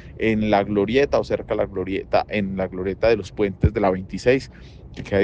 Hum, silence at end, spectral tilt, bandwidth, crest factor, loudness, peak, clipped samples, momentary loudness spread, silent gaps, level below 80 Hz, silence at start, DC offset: none; 0 s; -7 dB/octave; 9 kHz; 16 dB; -22 LUFS; -4 dBFS; under 0.1%; 7 LU; none; -38 dBFS; 0 s; under 0.1%